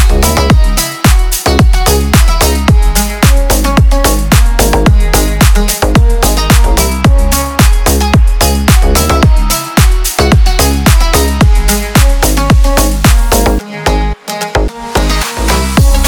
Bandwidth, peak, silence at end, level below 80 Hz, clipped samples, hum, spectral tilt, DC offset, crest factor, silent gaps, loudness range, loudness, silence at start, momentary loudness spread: over 20 kHz; 0 dBFS; 0 s; -10 dBFS; 0.5%; none; -4.5 dB/octave; under 0.1%; 8 dB; none; 2 LU; -9 LUFS; 0 s; 4 LU